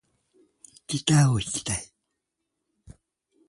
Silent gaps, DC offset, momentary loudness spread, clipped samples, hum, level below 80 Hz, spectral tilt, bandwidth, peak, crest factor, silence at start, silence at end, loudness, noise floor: none; under 0.1%; 22 LU; under 0.1%; none; -52 dBFS; -4.5 dB/octave; 11.5 kHz; -8 dBFS; 22 dB; 0.9 s; 1.65 s; -24 LUFS; -82 dBFS